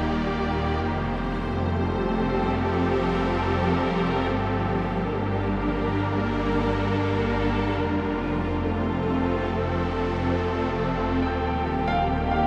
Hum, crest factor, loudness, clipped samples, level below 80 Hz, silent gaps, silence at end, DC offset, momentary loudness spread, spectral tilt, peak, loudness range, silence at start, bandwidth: none; 12 dB; -25 LUFS; under 0.1%; -34 dBFS; none; 0 s; under 0.1%; 3 LU; -8 dB/octave; -12 dBFS; 1 LU; 0 s; 8 kHz